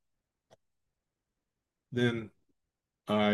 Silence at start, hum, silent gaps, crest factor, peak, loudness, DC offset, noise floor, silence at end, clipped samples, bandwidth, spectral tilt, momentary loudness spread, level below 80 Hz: 1.9 s; none; none; 20 dB; -16 dBFS; -33 LUFS; under 0.1%; -87 dBFS; 0 s; under 0.1%; 12 kHz; -6.5 dB/octave; 19 LU; -76 dBFS